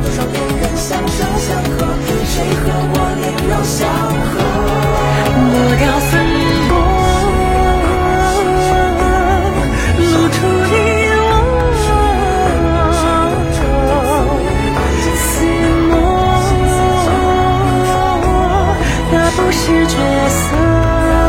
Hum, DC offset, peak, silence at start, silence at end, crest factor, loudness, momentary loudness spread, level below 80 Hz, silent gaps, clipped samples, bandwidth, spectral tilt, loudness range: none; under 0.1%; 0 dBFS; 0 s; 0 s; 12 dB; -13 LUFS; 4 LU; -20 dBFS; none; under 0.1%; 16.5 kHz; -5.5 dB/octave; 3 LU